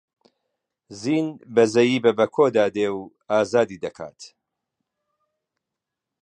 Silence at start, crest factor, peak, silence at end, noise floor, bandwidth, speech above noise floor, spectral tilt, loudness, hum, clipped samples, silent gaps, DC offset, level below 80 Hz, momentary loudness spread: 0.9 s; 20 dB; -4 dBFS; 1.95 s; -85 dBFS; 9.8 kHz; 64 dB; -5.5 dB/octave; -21 LUFS; none; under 0.1%; none; under 0.1%; -66 dBFS; 15 LU